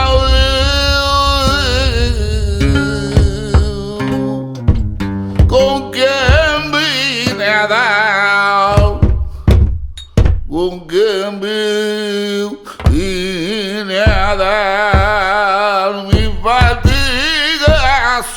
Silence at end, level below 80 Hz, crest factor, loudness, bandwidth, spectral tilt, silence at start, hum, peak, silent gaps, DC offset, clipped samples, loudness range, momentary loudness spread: 0 s; -18 dBFS; 12 dB; -13 LUFS; 17.5 kHz; -5 dB/octave; 0 s; none; 0 dBFS; none; under 0.1%; under 0.1%; 4 LU; 7 LU